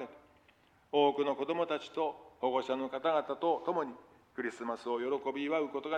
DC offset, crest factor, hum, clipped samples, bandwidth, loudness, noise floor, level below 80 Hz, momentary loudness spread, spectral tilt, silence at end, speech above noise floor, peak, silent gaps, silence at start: under 0.1%; 20 dB; none; under 0.1%; 9.4 kHz; -34 LUFS; -66 dBFS; -78 dBFS; 10 LU; -5.5 dB/octave; 0 s; 33 dB; -16 dBFS; none; 0 s